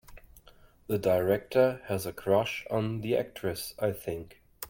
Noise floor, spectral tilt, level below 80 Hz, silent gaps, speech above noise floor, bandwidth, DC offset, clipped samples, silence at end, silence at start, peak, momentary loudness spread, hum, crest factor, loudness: -57 dBFS; -5.5 dB/octave; -58 dBFS; none; 28 dB; 17 kHz; under 0.1%; under 0.1%; 0 s; 0.1 s; -12 dBFS; 8 LU; none; 18 dB; -30 LUFS